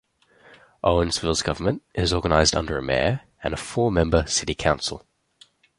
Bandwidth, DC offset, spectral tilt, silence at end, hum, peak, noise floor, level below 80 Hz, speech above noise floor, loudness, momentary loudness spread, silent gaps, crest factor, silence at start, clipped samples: 11.5 kHz; under 0.1%; -4 dB/octave; 0.8 s; none; -2 dBFS; -57 dBFS; -36 dBFS; 35 dB; -23 LUFS; 9 LU; none; 22 dB; 0.5 s; under 0.1%